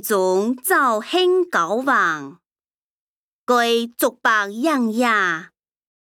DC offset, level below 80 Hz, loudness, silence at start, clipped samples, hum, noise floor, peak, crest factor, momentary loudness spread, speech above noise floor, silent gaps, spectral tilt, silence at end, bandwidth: under 0.1%; -74 dBFS; -19 LUFS; 0.05 s; under 0.1%; none; under -90 dBFS; -4 dBFS; 16 dB; 5 LU; over 71 dB; 2.52-2.56 s, 2.74-3.47 s; -3 dB/octave; 0.75 s; 18.5 kHz